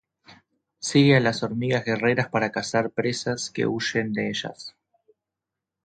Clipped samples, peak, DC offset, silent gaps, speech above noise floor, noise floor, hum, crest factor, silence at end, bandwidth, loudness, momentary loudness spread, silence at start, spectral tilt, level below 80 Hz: under 0.1%; -4 dBFS; under 0.1%; none; 63 dB; -86 dBFS; none; 20 dB; 1.15 s; 9.4 kHz; -24 LUFS; 12 LU; 0.3 s; -5 dB/octave; -62 dBFS